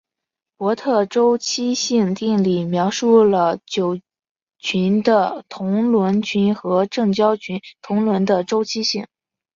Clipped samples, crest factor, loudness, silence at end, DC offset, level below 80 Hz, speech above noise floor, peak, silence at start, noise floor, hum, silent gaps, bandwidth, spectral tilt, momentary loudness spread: under 0.1%; 16 dB; -18 LUFS; 0.5 s; under 0.1%; -62 dBFS; 67 dB; -4 dBFS; 0.6 s; -85 dBFS; none; 4.31-4.35 s, 4.42-4.46 s; 7.6 kHz; -5.5 dB/octave; 8 LU